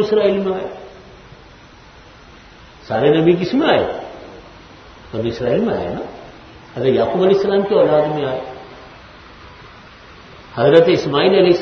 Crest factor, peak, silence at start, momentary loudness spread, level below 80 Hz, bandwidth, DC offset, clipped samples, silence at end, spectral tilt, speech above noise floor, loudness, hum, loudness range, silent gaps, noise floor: 18 dB; 0 dBFS; 0 s; 22 LU; -48 dBFS; 6.6 kHz; under 0.1%; under 0.1%; 0 s; -7 dB/octave; 28 dB; -16 LUFS; none; 4 LU; none; -42 dBFS